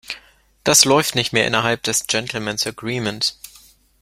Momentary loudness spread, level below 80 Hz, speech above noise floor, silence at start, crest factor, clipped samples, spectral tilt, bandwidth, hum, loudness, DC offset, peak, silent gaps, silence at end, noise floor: 12 LU; -54 dBFS; 31 dB; 0.1 s; 20 dB; under 0.1%; -2 dB/octave; 16.5 kHz; none; -18 LUFS; under 0.1%; 0 dBFS; none; 0.55 s; -50 dBFS